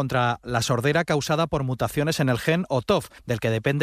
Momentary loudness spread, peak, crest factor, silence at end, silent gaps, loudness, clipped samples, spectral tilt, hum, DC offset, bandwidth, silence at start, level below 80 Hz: 4 LU; -8 dBFS; 16 dB; 0 s; none; -24 LUFS; under 0.1%; -5.5 dB/octave; none; under 0.1%; 15 kHz; 0 s; -48 dBFS